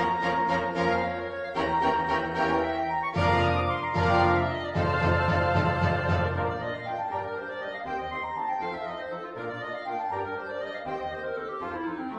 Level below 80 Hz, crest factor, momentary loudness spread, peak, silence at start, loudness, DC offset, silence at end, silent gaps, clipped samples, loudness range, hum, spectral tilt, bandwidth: -48 dBFS; 18 dB; 10 LU; -10 dBFS; 0 s; -28 LUFS; under 0.1%; 0 s; none; under 0.1%; 8 LU; none; -7 dB/octave; 9.8 kHz